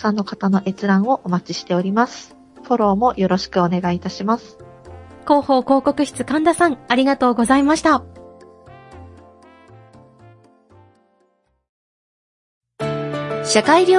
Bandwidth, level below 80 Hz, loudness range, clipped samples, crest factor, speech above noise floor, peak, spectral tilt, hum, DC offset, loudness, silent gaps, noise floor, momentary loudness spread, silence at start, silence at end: 11.5 kHz; -52 dBFS; 8 LU; under 0.1%; 18 dB; 47 dB; 0 dBFS; -5.5 dB/octave; none; under 0.1%; -18 LUFS; 11.69-12.61 s; -64 dBFS; 9 LU; 0 s; 0 s